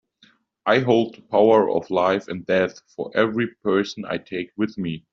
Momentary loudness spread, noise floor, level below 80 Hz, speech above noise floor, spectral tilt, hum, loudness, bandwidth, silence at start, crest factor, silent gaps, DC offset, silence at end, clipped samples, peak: 12 LU; -59 dBFS; -64 dBFS; 38 dB; -4.5 dB/octave; none; -22 LUFS; 7.4 kHz; 0.65 s; 18 dB; none; under 0.1%; 0.15 s; under 0.1%; -4 dBFS